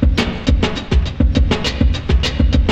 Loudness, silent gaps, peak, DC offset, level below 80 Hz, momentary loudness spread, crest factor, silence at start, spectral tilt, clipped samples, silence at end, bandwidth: -17 LUFS; none; -2 dBFS; under 0.1%; -16 dBFS; 2 LU; 12 dB; 0 s; -6 dB/octave; under 0.1%; 0 s; 8.6 kHz